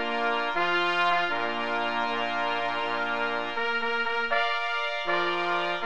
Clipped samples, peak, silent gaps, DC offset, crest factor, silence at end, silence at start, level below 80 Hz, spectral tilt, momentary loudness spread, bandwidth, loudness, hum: under 0.1%; -10 dBFS; none; 1%; 16 dB; 0 s; 0 s; -66 dBFS; -3.5 dB/octave; 4 LU; 9.2 kHz; -27 LUFS; none